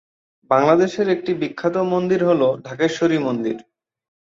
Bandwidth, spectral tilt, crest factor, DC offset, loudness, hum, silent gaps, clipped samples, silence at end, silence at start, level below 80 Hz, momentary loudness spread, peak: 7.6 kHz; -6.5 dB/octave; 18 dB; under 0.1%; -19 LUFS; none; none; under 0.1%; 0.75 s; 0.5 s; -62 dBFS; 8 LU; -2 dBFS